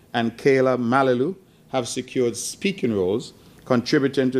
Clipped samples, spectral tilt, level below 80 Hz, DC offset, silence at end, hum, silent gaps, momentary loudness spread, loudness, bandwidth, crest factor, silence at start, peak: under 0.1%; -5 dB/octave; -62 dBFS; under 0.1%; 0 s; none; none; 9 LU; -22 LUFS; 14.5 kHz; 18 dB; 0.15 s; -4 dBFS